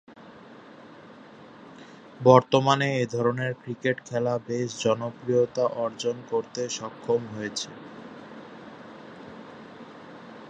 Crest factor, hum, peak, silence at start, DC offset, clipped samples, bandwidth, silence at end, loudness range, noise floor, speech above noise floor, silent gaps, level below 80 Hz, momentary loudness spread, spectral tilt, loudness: 26 dB; none; -2 dBFS; 0.1 s; under 0.1%; under 0.1%; 9.2 kHz; 0 s; 10 LU; -48 dBFS; 23 dB; none; -70 dBFS; 25 LU; -5.5 dB/octave; -26 LUFS